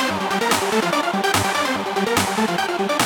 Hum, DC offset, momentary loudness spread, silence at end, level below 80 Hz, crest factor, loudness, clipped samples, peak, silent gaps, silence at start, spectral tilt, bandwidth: none; under 0.1%; 3 LU; 0 s; -56 dBFS; 18 dB; -20 LUFS; under 0.1%; -2 dBFS; none; 0 s; -3 dB/octave; over 20 kHz